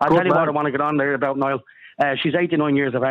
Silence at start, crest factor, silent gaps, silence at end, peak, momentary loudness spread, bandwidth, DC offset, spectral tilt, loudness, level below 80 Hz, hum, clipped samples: 0 s; 12 dB; none; 0 s; -6 dBFS; 6 LU; 6 kHz; under 0.1%; -8 dB/octave; -20 LUFS; -60 dBFS; none; under 0.1%